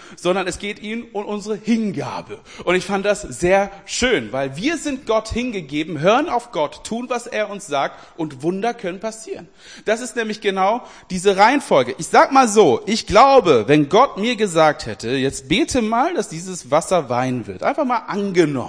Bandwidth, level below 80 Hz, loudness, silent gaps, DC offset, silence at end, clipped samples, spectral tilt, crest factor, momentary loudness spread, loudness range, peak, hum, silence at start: 10.5 kHz; -46 dBFS; -18 LUFS; none; 0.2%; 0 s; under 0.1%; -4.5 dB/octave; 18 dB; 13 LU; 9 LU; 0 dBFS; none; 0 s